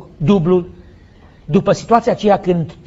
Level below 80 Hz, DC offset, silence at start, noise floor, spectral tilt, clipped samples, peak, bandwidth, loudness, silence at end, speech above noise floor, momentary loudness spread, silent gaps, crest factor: -42 dBFS; under 0.1%; 0 s; -43 dBFS; -7.5 dB/octave; under 0.1%; 0 dBFS; 8 kHz; -15 LUFS; 0.15 s; 29 dB; 5 LU; none; 16 dB